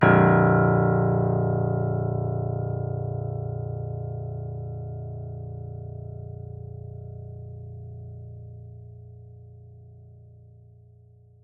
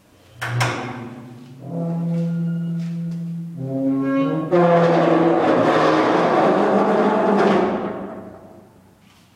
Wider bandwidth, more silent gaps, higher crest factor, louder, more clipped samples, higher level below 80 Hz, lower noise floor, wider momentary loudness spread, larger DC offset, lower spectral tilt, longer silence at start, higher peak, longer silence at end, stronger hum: second, 3.6 kHz vs 12.5 kHz; neither; first, 22 dB vs 14 dB; second, -25 LUFS vs -19 LUFS; neither; first, -52 dBFS vs -60 dBFS; about the same, -53 dBFS vs -51 dBFS; first, 24 LU vs 16 LU; neither; first, -12 dB/octave vs -7 dB/octave; second, 0 s vs 0.35 s; about the same, -4 dBFS vs -6 dBFS; about the same, 0.85 s vs 0.75 s; neither